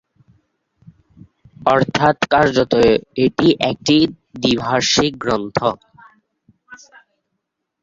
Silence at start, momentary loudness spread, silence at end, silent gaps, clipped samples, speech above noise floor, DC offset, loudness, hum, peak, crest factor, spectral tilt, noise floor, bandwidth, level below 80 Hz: 1.6 s; 7 LU; 1.05 s; none; under 0.1%; 60 dB; under 0.1%; -16 LUFS; none; 0 dBFS; 18 dB; -4.5 dB/octave; -76 dBFS; 7.8 kHz; -48 dBFS